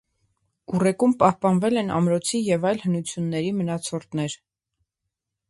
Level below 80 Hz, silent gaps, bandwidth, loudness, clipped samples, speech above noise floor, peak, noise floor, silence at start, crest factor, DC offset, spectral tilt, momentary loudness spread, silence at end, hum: -62 dBFS; none; 11.5 kHz; -23 LUFS; under 0.1%; 61 dB; -4 dBFS; -83 dBFS; 0.7 s; 20 dB; under 0.1%; -6 dB/octave; 10 LU; 1.15 s; none